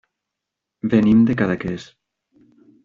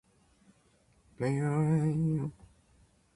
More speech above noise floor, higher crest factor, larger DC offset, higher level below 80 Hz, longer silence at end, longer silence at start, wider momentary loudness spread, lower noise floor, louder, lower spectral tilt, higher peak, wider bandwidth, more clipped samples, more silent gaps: first, 66 dB vs 38 dB; about the same, 18 dB vs 16 dB; neither; first, -52 dBFS vs -62 dBFS; first, 1 s vs 0.85 s; second, 0.85 s vs 1.2 s; first, 14 LU vs 8 LU; first, -83 dBFS vs -67 dBFS; first, -18 LUFS vs -31 LUFS; about the same, -8.5 dB/octave vs -9 dB/octave; first, -4 dBFS vs -18 dBFS; second, 7.2 kHz vs 11 kHz; neither; neither